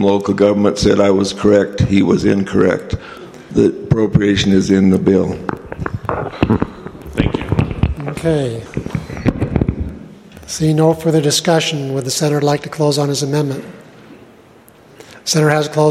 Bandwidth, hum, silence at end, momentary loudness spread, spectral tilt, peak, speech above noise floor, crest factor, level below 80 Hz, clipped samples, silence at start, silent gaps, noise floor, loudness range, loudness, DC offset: 15 kHz; none; 0 s; 13 LU; -5.5 dB/octave; 0 dBFS; 30 dB; 16 dB; -34 dBFS; under 0.1%; 0 s; none; -44 dBFS; 5 LU; -15 LUFS; under 0.1%